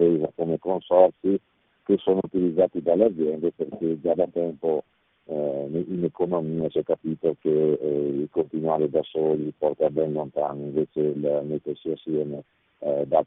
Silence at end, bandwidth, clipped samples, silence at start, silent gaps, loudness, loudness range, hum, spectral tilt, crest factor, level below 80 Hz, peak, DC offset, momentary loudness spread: 0 s; 3.9 kHz; under 0.1%; 0 s; none; -25 LUFS; 4 LU; none; -8 dB/octave; 22 dB; -64 dBFS; -2 dBFS; under 0.1%; 8 LU